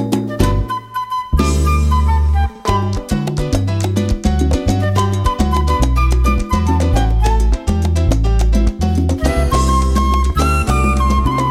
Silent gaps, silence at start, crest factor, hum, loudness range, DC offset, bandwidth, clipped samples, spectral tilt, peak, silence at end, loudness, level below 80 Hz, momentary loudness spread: none; 0 s; 12 dB; none; 2 LU; under 0.1%; 14.5 kHz; under 0.1%; -6.5 dB/octave; -2 dBFS; 0 s; -16 LUFS; -16 dBFS; 4 LU